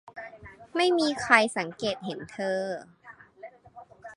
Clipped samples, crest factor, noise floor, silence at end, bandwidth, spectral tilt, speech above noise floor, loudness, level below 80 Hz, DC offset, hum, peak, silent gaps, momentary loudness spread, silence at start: under 0.1%; 26 dB; -51 dBFS; 0 s; 11.5 kHz; -3.5 dB/octave; 25 dB; -26 LUFS; -66 dBFS; under 0.1%; none; -2 dBFS; none; 26 LU; 0.05 s